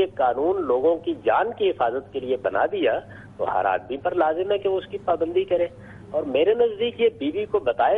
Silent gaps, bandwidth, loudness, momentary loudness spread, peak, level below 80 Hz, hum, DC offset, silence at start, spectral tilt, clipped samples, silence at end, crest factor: none; 4 kHz; -23 LUFS; 7 LU; -8 dBFS; -56 dBFS; none; under 0.1%; 0 s; -7.5 dB/octave; under 0.1%; 0 s; 14 dB